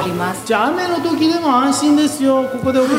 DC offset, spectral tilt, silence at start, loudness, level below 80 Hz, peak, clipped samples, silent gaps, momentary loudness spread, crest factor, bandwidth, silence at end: under 0.1%; -4.5 dB/octave; 0 s; -16 LUFS; -54 dBFS; 0 dBFS; under 0.1%; none; 4 LU; 14 dB; 16 kHz; 0 s